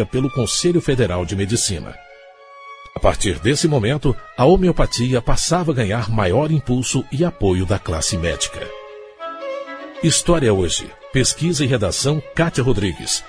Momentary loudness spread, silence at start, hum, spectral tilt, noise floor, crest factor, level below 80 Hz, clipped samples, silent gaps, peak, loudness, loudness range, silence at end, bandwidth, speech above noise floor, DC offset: 13 LU; 0 s; none; -4.5 dB/octave; -43 dBFS; 16 dB; -30 dBFS; under 0.1%; none; -2 dBFS; -18 LUFS; 3 LU; 0 s; 11 kHz; 25 dB; under 0.1%